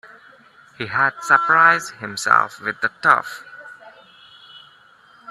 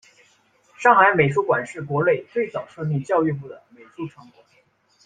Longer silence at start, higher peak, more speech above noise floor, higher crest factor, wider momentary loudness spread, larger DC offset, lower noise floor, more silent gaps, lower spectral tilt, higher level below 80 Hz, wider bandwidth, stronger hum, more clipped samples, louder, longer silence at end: about the same, 0.8 s vs 0.8 s; about the same, 0 dBFS vs -2 dBFS; second, 33 dB vs 40 dB; about the same, 20 dB vs 20 dB; about the same, 20 LU vs 21 LU; neither; second, -51 dBFS vs -61 dBFS; neither; second, -2.5 dB/octave vs -7 dB/octave; second, -68 dBFS vs -62 dBFS; first, 13 kHz vs 9.4 kHz; neither; neither; first, -17 LUFS vs -20 LUFS; second, 0.7 s vs 0.95 s